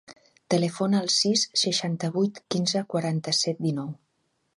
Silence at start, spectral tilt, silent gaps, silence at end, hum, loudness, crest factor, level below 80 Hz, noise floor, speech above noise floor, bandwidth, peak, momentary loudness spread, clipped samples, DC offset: 0.1 s; -4 dB/octave; none; 0.6 s; none; -25 LUFS; 18 dB; -72 dBFS; -73 dBFS; 48 dB; 11.5 kHz; -8 dBFS; 7 LU; under 0.1%; under 0.1%